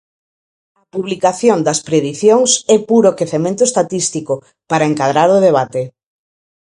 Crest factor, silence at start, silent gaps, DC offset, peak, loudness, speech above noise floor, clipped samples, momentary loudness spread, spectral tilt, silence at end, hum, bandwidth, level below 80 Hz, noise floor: 14 dB; 0.95 s; none; under 0.1%; 0 dBFS; -14 LUFS; over 77 dB; under 0.1%; 12 LU; -4 dB/octave; 0.85 s; none; 11.5 kHz; -60 dBFS; under -90 dBFS